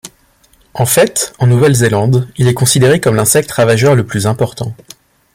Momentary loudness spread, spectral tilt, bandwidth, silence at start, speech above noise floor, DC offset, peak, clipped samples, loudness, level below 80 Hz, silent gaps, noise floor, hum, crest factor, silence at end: 8 LU; -5 dB/octave; 16.5 kHz; 0.05 s; 40 dB; under 0.1%; 0 dBFS; under 0.1%; -11 LUFS; -44 dBFS; none; -50 dBFS; none; 12 dB; 0.6 s